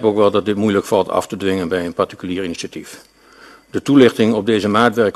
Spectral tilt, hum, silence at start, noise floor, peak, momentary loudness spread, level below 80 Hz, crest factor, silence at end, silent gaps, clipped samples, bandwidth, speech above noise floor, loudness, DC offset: -5.5 dB/octave; none; 0 s; -44 dBFS; 0 dBFS; 15 LU; -54 dBFS; 16 dB; 0.05 s; none; under 0.1%; 13 kHz; 28 dB; -16 LUFS; under 0.1%